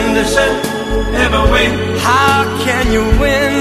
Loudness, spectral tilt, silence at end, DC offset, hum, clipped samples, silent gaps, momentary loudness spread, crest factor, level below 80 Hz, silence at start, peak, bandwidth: -13 LUFS; -4.5 dB/octave; 0 s; under 0.1%; none; under 0.1%; none; 6 LU; 12 dB; -20 dBFS; 0 s; 0 dBFS; 14 kHz